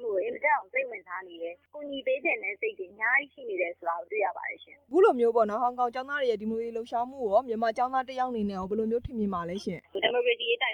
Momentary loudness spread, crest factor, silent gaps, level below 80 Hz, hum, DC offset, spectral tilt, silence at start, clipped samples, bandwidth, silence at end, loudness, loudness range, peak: 12 LU; 18 dB; none; -60 dBFS; none; under 0.1%; -5.5 dB/octave; 0 s; under 0.1%; 9.6 kHz; 0 s; -29 LUFS; 3 LU; -12 dBFS